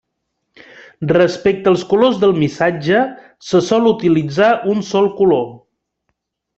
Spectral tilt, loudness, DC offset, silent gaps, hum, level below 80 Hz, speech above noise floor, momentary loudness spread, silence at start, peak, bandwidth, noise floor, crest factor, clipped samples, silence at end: -6.5 dB/octave; -15 LUFS; under 0.1%; none; none; -54 dBFS; 59 dB; 5 LU; 1 s; 0 dBFS; 8 kHz; -73 dBFS; 16 dB; under 0.1%; 1 s